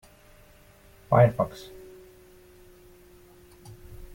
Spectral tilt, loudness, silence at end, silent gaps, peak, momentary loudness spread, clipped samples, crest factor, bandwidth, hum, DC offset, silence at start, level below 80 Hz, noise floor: -8 dB/octave; -23 LUFS; 0.1 s; none; -6 dBFS; 28 LU; under 0.1%; 24 dB; 17 kHz; none; under 0.1%; 1.1 s; -52 dBFS; -55 dBFS